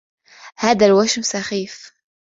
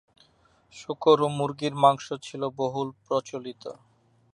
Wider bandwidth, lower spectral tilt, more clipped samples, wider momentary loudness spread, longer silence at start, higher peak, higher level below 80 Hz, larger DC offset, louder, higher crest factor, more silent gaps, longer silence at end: second, 7.8 kHz vs 10.5 kHz; second, -3.5 dB/octave vs -6 dB/octave; neither; about the same, 16 LU vs 18 LU; second, 0.45 s vs 0.75 s; about the same, -2 dBFS vs -4 dBFS; first, -58 dBFS vs -70 dBFS; neither; first, -17 LUFS vs -26 LUFS; about the same, 18 dB vs 22 dB; neither; second, 0.35 s vs 0.6 s